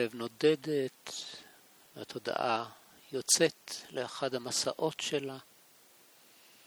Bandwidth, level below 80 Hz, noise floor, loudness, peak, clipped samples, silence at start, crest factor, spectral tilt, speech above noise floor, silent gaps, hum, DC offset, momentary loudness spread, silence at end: over 20 kHz; -82 dBFS; -61 dBFS; -33 LUFS; -12 dBFS; under 0.1%; 0 s; 24 dB; -2.5 dB/octave; 28 dB; none; none; under 0.1%; 18 LU; 1.25 s